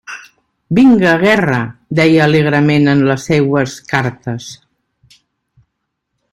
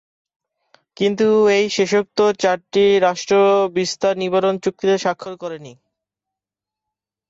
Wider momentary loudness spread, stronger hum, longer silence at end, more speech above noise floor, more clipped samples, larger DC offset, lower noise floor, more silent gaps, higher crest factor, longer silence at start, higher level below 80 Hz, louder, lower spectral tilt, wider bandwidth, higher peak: first, 15 LU vs 10 LU; neither; first, 1.75 s vs 1.55 s; second, 61 dB vs 70 dB; neither; neither; second, -72 dBFS vs -87 dBFS; neither; about the same, 14 dB vs 14 dB; second, 0.1 s vs 1 s; first, -48 dBFS vs -64 dBFS; first, -12 LUFS vs -17 LUFS; first, -6.5 dB/octave vs -4.5 dB/octave; first, 13 kHz vs 7.8 kHz; first, 0 dBFS vs -4 dBFS